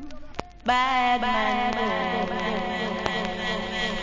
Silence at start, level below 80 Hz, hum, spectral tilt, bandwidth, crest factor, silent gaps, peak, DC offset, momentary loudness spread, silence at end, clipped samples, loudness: 0 s; -46 dBFS; none; -4.5 dB/octave; 7.6 kHz; 20 dB; none; -6 dBFS; under 0.1%; 7 LU; 0 s; under 0.1%; -25 LUFS